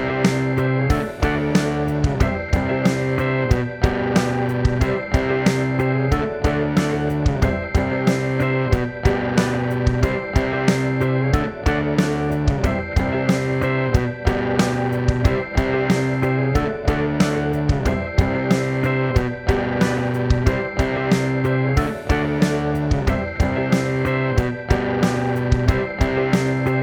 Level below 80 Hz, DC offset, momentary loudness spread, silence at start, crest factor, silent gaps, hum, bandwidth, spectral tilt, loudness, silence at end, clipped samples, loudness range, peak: -28 dBFS; under 0.1%; 2 LU; 0 s; 18 dB; none; none; 18 kHz; -6.5 dB/octave; -20 LUFS; 0 s; under 0.1%; 0 LU; -2 dBFS